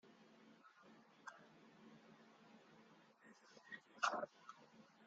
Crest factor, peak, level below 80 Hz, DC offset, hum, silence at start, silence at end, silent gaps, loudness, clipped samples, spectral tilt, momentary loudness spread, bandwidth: 30 dB; -24 dBFS; under -90 dBFS; under 0.1%; none; 0.05 s; 0 s; none; -48 LUFS; under 0.1%; -2 dB/octave; 24 LU; 8.4 kHz